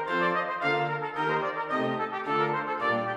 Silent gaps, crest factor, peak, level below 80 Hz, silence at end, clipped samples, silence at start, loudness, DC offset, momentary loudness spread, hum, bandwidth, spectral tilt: none; 16 dB; -12 dBFS; -72 dBFS; 0 s; under 0.1%; 0 s; -28 LUFS; under 0.1%; 3 LU; none; 10.5 kHz; -6.5 dB/octave